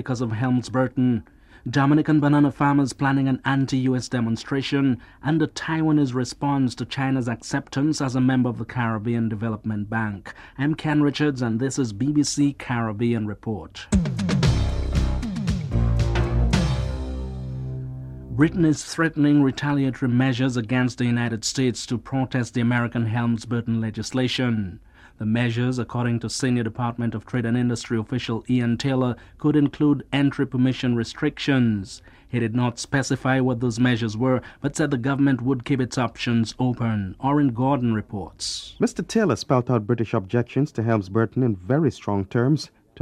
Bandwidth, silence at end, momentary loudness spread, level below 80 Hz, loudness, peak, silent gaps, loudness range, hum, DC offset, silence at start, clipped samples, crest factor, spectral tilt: 11.5 kHz; 0 s; 7 LU; -36 dBFS; -23 LUFS; -4 dBFS; none; 3 LU; none; under 0.1%; 0 s; under 0.1%; 18 dB; -6 dB/octave